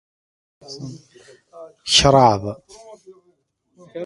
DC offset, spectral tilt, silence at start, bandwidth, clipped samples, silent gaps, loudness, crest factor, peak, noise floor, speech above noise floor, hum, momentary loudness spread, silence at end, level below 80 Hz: under 0.1%; -3.5 dB/octave; 0.7 s; 11.5 kHz; under 0.1%; none; -15 LUFS; 22 dB; 0 dBFS; -64 dBFS; 46 dB; none; 25 LU; 0 s; -44 dBFS